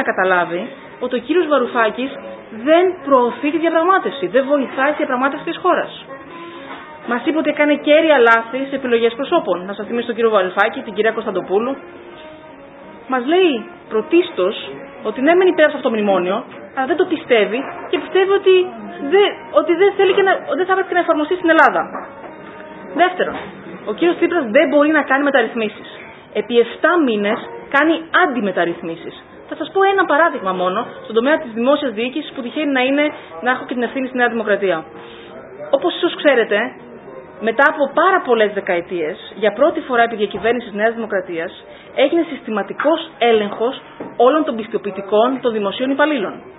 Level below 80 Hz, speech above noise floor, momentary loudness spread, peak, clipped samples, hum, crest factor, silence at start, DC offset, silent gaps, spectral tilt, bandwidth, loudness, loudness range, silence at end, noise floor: -62 dBFS; 22 dB; 16 LU; 0 dBFS; under 0.1%; none; 16 dB; 0 s; under 0.1%; none; -7 dB/octave; 4 kHz; -17 LUFS; 4 LU; 0 s; -38 dBFS